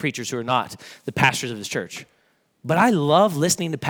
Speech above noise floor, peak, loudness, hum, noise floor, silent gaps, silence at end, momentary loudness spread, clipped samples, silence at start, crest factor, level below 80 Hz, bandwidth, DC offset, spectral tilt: 32 dB; -2 dBFS; -21 LUFS; none; -54 dBFS; none; 0 s; 17 LU; under 0.1%; 0 s; 20 dB; -62 dBFS; over 20 kHz; under 0.1%; -4 dB/octave